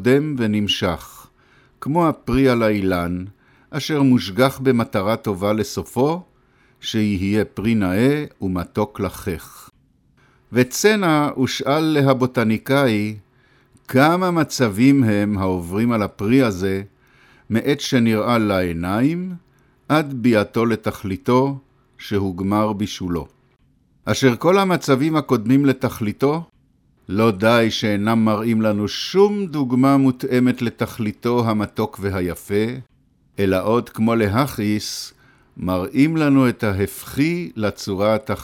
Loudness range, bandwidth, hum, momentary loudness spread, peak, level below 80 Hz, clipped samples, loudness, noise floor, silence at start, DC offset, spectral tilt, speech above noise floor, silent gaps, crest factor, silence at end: 4 LU; 17 kHz; none; 10 LU; -2 dBFS; -48 dBFS; under 0.1%; -19 LUFS; -59 dBFS; 0 s; under 0.1%; -6 dB/octave; 40 dB; none; 18 dB; 0 s